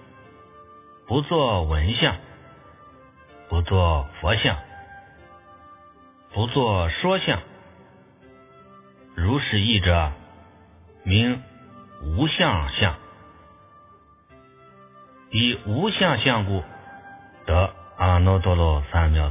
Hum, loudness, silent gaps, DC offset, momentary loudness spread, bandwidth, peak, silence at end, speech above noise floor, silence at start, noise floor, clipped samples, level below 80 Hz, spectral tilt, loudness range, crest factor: none; -22 LUFS; none; under 0.1%; 16 LU; 3.8 kHz; -4 dBFS; 0 s; 32 dB; 0.6 s; -53 dBFS; under 0.1%; -32 dBFS; -10 dB/octave; 4 LU; 20 dB